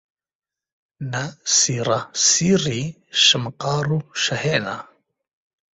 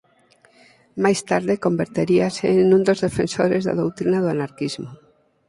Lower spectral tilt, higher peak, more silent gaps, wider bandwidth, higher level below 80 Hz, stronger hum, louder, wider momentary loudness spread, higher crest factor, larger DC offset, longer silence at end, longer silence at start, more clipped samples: second, -2.5 dB/octave vs -6 dB/octave; about the same, -4 dBFS vs -2 dBFS; neither; second, 8.2 kHz vs 11.5 kHz; about the same, -58 dBFS vs -56 dBFS; neither; about the same, -19 LUFS vs -20 LUFS; about the same, 13 LU vs 11 LU; about the same, 20 dB vs 18 dB; neither; first, 0.9 s vs 0.55 s; about the same, 1 s vs 0.95 s; neither